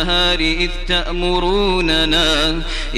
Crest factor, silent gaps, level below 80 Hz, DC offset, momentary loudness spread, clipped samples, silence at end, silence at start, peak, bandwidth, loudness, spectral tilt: 14 dB; none; -22 dBFS; under 0.1%; 5 LU; under 0.1%; 0 s; 0 s; -2 dBFS; 12.5 kHz; -16 LUFS; -4 dB/octave